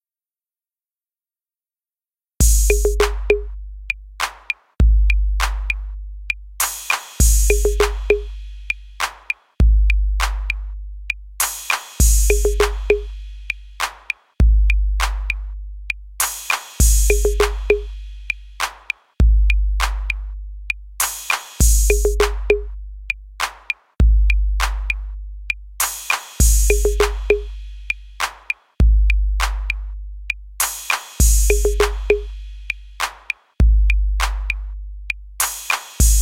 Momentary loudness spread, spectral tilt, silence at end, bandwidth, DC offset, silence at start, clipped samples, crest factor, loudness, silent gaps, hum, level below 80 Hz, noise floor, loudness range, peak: 12 LU; -3.5 dB/octave; 0 s; 16.5 kHz; under 0.1%; 2.4 s; under 0.1%; 18 dB; -20 LUFS; none; none; -20 dBFS; under -90 dBFS; 3 LU; 0 dBFS